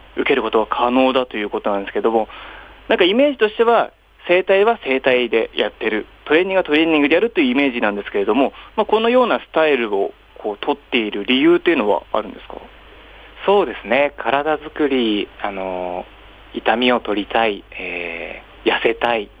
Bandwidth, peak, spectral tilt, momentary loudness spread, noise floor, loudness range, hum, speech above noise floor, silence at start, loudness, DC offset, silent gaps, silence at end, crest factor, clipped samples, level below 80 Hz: 8 kHz; -2 dBFS; -6.5 dB/octave; 12 LU; -42 dBFS; 4 LU; none; 24 dB; 0.15 s; -18 LUFS; under 0.1%; none; 0.15 s; 16 dB; under 0.1%; -48 dBFS